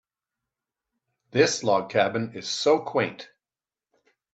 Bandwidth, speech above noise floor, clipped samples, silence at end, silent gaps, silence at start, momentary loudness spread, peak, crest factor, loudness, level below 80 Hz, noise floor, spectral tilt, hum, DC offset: 8.6 kHz; over 66 dB; under 0.1%; 1.1 s; none; 1.35 s; 9 LU; -6 dBFS; 22 dB; -24 LUFS; -72 dBFS; under -90 dBFS; -4 dB/octave; none; under 0.1%